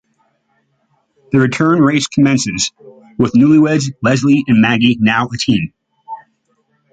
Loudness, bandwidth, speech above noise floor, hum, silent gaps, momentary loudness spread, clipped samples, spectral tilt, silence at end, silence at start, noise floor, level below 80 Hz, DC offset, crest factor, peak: -13 LUFS; 9.2 kHz; 50 dB; none; none; 17 LU; under 0.1%; -5 dB/octave; 0.75 s; 1.35 s; -62 dBFS; -48 dBFS; under 0.1%; 14 dB; -2 dBFS